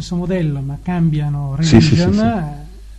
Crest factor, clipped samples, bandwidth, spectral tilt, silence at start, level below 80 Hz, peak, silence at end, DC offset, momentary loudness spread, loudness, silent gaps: 16 dB; 0.4%; 8.6 kHz; -7 dB/octave; 0 s; -32 dBFS; 0 dBFS; 0 s; under 0.1%; 12 LU; -16 LUFS; none